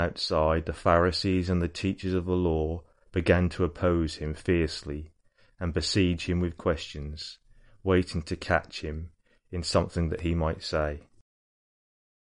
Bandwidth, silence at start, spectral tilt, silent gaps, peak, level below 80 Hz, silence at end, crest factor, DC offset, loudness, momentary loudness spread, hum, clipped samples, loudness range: 10.5 kHz; 0 s; -6 dB/octave; none; -8 dBFS; -42 dBFS; 1.25 s; 22 dB; under 0.1%; -28 LUFS; 13 LU; none; under 0.1%; 4 LU